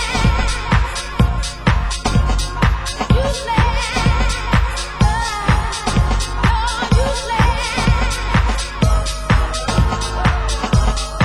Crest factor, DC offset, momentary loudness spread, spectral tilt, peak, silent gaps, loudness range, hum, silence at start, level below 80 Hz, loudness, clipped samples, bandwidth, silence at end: 16 dB; under 0.1%; 2 LU; -5 dB/octave; 0 dBFS; none; 1 LU; none; 0 s; -20 dBFS; -18 LUFS; under 0.1%; 12.5 kHz; 0 s